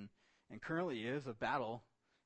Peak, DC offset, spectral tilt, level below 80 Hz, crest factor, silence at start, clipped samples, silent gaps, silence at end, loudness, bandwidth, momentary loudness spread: -24 dBFS; under 0.1%; -6.5 dB/octave; -76 dBFS; 18 dB; 0 s; under 0.1%; none; 0.45 s; -42 LUFS; 8.4 kHz; 15 LU